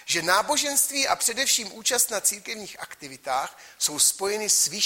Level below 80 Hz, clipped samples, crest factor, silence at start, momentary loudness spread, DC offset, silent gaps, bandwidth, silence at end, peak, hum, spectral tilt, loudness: -66 dBFS; under 0.1%; 20 dB; 0 s; 15 LU; under 0.1%; none; 16.5 kHz; 0 s; -6 dBFS; none; 0.5 dB/octave; -22 LUFS